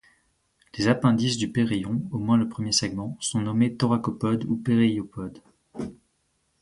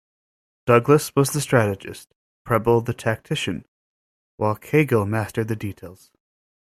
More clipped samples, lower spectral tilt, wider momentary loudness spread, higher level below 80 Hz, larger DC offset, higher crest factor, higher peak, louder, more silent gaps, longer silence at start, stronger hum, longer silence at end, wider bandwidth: neither; about the same, -5 dB/octave vs -6 dB/octave; about the same, 15 LU vs 15 LU; about the same, -56 dBFS vs -54 dBFS; neither; about the same, 20 dB vs 20 dB; second, -6 dBFS vs -2 dBFS; second, -24 LUFS vs -21 LUFS; second, none vs 2.16-2.45 s, 3.68-4.38 s; about the same, 0.75 s vs 0.65 s; neither; second, 0.65 s vs 0.8 s; second, 11.5 kHz vs 15.5 kHz